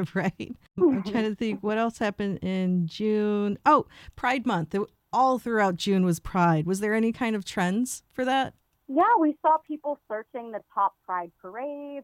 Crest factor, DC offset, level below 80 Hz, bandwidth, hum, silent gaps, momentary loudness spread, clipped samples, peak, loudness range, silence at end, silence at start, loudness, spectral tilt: 18 dB; under 0.1%; -56 dBFS; 16 kHz; none; none; 12 LU; under 0.1%; -8 dBFS; 2 LU; 0 s; 0 s; -26 LUFS; -6 dB/octave